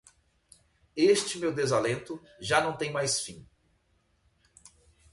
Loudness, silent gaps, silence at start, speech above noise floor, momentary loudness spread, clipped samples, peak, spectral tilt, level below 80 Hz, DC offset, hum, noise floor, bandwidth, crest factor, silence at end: -28 LUFS; none; 0.95 s; 42 dB; 15 LU; under 0.1%; -10 dBFS; -3.5 dB/octave; -64 dBFS; under 0.1%; none; -70 dBFS; 11.5 kHz; 22 dB; 1.7 s